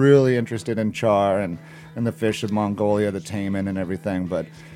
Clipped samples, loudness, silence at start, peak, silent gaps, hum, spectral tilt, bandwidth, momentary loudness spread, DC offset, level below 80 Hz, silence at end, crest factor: under 0.1%; -23 LUFS; 0 s; -2 dBFS; none; none; -7 dB/octave; 15.5 kHz; 9 LU; under 0.1%; -58 dBFS; 0 s; 18 dB